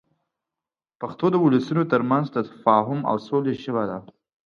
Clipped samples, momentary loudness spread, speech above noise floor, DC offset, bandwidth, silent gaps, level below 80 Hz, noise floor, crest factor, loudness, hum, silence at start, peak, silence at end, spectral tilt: under 0.1%; 10 LU; 68 dB; under 0.1%; 6.8 kHz; none; -68 dBFS; -90 dBFS; 20 dB; -22 LUFS; none; 1 s; -4 dBFS; 0.45 s; -8.5 dB/octave